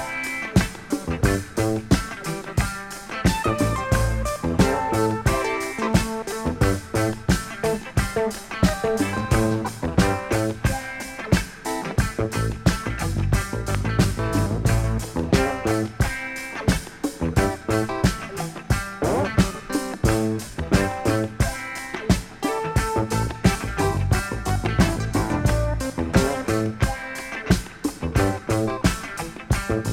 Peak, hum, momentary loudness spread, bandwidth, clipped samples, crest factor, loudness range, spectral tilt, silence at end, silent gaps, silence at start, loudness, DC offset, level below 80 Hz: -2 dBFS; none; 6 LU; 17 kHz; under 0.1%; 20 dB; 2 LU; -5.5 dB/octave; 0 s; none; 0 s; -24 LUFS; under 0.1%; -32 dBFS